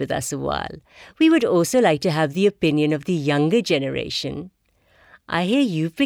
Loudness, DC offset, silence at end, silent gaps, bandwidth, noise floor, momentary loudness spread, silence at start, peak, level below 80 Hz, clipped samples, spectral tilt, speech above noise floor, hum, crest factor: -20 LUFS; under 0.1%; 0 s; none; 16.5 kHz; -59 dBFS; 9 LU; 0 s; -6 dBFS; -52 dBFS; under 0.1%; -5.5 dB/octave; 38 dB; none; 16 dB